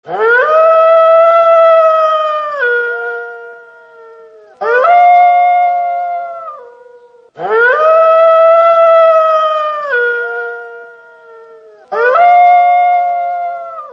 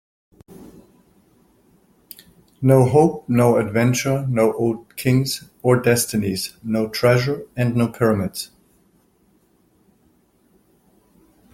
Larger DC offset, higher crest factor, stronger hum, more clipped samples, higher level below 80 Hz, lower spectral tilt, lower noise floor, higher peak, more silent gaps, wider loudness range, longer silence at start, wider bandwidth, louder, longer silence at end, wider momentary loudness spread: neither; second, 10 dB vs 20 dB; neither; neither; second, -70 dBFS vs -54 dBFS; second, -3 dB/octave vs -6 dB/octave; second, -41 dBFS vs -60 dBFS; about the same, 0 dBFS vs -2 dBFS; neither; about the same, 5 LU vs 7 LU; second, 0.05 s vs 0.6 s; second, 6 kHz vs 16.5 kHz; first, -9 LUFS vs -19 LUFS; second, 0 s vs 3.1 s; first, 15 LU vs 9 LU